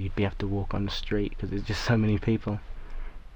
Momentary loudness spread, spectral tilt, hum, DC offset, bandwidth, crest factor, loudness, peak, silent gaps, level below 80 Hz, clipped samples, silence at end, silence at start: 19 LU; -7 dB/octave; none; under 0.1%; 19.5 kHz; 16 dB; -29 LUFS; -12 dBFS; none; -36 dBFS; under 0.1%; 0 s; 0 s